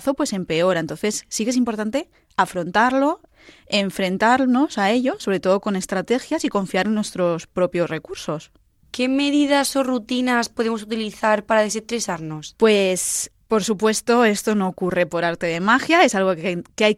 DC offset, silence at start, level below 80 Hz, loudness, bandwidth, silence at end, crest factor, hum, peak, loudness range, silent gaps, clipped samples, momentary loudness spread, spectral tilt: under 0.1%; 0 s; -56 dBFS; -20 LUFS; 15.5 kHz; 0 s; 18 dB; none; -2 dBFS; 3 LU; none; under 0.1%; 8 LU; -4 dB/octave